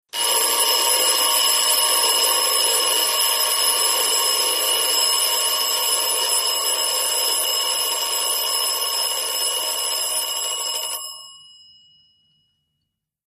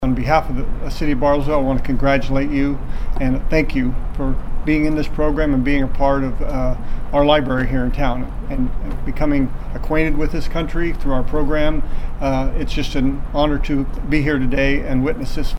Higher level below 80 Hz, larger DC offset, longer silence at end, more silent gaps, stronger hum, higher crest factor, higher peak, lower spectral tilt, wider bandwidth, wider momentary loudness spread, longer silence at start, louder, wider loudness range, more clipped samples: second, -78 dBFS vs -20 dBFS; neither; first, 1.9 s vs 0 s; neither; neither; about the same, 16 dB vs 14 dB; about the same, -4 dBFS vs -2 dBFS; second, 3.5 dB/octave vs -7 dB/octave; first, 15 kHz vs 6.4 kHz; second, 5 LU vs 8 LU; first, 0.15 s vs 0 s; first, -17 LUFS vs -20 LUFS; first, 7 LU vs 3 LU; neither